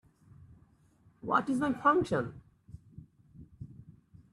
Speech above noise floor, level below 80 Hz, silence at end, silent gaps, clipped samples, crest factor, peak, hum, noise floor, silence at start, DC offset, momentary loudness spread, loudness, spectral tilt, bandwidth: 35 dB; -64 dBFS; 0.4 s; none; under 0.1%; 22 dB; -14 dBFS; none; -65 dBFS; 1.25 s; under 0.1%; 24 LU; -30 LUFS; -7 dB/octave; 12 kHz